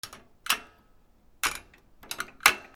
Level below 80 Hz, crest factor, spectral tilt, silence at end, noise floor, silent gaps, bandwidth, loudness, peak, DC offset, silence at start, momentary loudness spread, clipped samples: -58 dBFS; 32 dB; 1 dB/octave; 0.1 s; -60 dBFS; none; over 20 kHz; -28 LUFS; 0 dBFS; under 0.1%; 0.05 s; 19 LU; under 0.1%